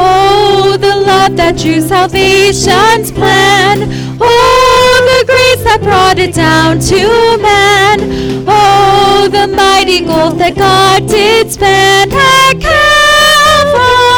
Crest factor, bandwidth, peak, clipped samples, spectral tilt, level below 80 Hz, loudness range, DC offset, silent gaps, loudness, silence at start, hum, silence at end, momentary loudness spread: 6 dB; over 20 kHz; 0 dBFS; under 0.1%; -3.5 dB/octave; -28 dBFS; 2 LU; under 0.1%; none; -6 LUFS; 0 s; none; 0 s; 5 LU